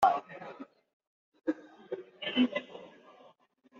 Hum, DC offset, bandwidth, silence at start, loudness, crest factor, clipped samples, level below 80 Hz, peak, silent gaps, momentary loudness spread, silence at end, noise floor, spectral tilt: none; under 0.1%; 7.4 kHz; 0 s; -34 LUFS; 24 dB; under 0.1%; -76 dBFS; -12 dBFS; 0.93-1.00 s, 1.07-1.32 s; 21 LU; 0.9 s; -64 dBFS; -1.5 dB/octave